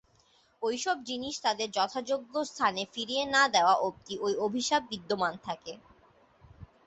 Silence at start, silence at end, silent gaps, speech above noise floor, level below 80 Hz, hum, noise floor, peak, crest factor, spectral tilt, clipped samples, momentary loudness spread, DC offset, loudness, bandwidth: 0.6 s; 0.2 s; none; 36 dB; -66 dBFS; none; -66 dBFS; -10 dBFS; 20 dB; -2.5 dB/octave; under 0.1%; 11 LU; under 0.1%; -30 LUFS; 8.4 kHz